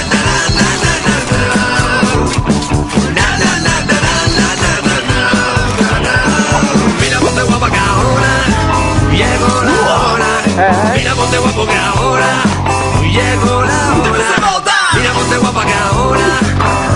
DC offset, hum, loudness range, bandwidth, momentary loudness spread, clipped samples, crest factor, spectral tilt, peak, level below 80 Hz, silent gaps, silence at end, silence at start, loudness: under 0.1%; none; 1 LU; 11 kHz; 2 LU; under 0.1%; 10 dB; -4 dB/octave; 0 dBFS; -24 dBFS; none; 0 s; 0 s; -11 LUFS